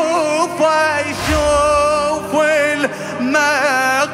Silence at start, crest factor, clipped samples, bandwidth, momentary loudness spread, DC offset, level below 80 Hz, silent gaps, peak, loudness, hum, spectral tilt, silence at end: 0 s; 10 dB; under 0.1%; 16 kHz; 4 LU; under 0.1%; -34 dBFS; none; -4 dBFS; -15 LUFS; none; -3.5 dB/octave; 0 s